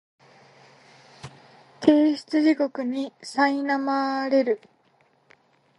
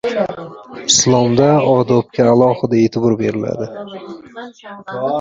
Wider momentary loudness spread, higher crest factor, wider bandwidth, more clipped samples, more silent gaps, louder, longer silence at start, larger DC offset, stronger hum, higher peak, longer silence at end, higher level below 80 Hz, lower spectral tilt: about the same, 19 LU vs 20 LU; first, 22 dB vs 14 dB; first, 11 kHz vs 8 kHz; neither; neither; second, -23 LUFS vs -14 LUFS; first, 1.25 s vs 0.05 s; neither; neither; about the same, -2 dBFS vs 0 dBFS; first, 1.2 s vs 0 s; second, -70 dBFS vs -50 dBFS; about the same, -5 dB/octave vs -4.5 dB/octave